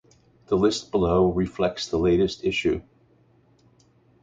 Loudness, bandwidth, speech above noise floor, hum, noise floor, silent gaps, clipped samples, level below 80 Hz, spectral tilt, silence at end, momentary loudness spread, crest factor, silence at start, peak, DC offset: -23 LUFS; 9 kHz; 37 dB; none; -60 dBFS; none; under 0.1%; -44 dBFS; -6 dB/octave; 1.4 s; 6 LU; 18 dB; 0.5 s; -8 dBFS; under 0.1%